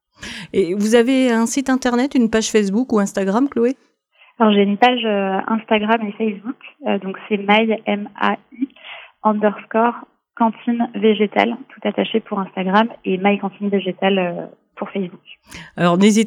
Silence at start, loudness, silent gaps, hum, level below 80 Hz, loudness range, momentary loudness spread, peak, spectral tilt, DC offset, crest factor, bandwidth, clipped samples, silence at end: 0.2 s; -18 LUFS; none; none; -58 dBFS; 3 LU; 13 LU; 0 dBFS; -5 dB/octave; under 0.1%; 18 dB; 13 kHz; under 0.1%; 0 s